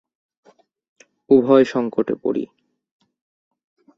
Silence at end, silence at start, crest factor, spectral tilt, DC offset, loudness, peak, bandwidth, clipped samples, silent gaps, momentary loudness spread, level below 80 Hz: 1.5 s; 1.3 s; 20 dB; -7.5 dB/octave; under 0.1%; -18 LUFS; -2 dBFS; 7.4 kHz; under 0.1%; none; 12 LU; -66 dBFS